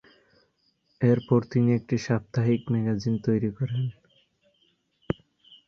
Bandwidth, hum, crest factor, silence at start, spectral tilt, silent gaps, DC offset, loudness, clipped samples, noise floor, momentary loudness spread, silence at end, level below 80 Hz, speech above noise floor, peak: 7 kHz; none; 20 dB; 1 s; -8.5 dB/octave; none; under 0.1%; -26 LUFS; under 0.1%; -70 dBFS; 11 LU; 0.55 s; -58 dBFS; 46 dB; -8 dBFS